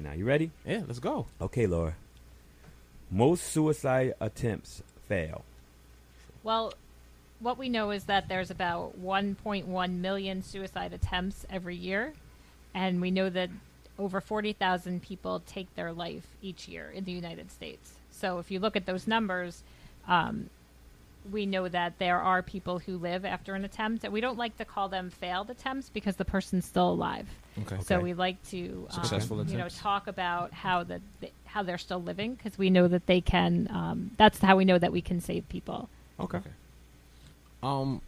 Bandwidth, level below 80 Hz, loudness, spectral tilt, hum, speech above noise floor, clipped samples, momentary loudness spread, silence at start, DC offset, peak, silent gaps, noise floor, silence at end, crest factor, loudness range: 15.5 kHz; -50 dBFS; -31 LUFS; -6 dB/octave; none; 25 dB; under 0.1%; 15 LU; 0 s; under 0.1%; -6 dBFS; none; -56 dBFS; 0 s; 26 dB; 8 LU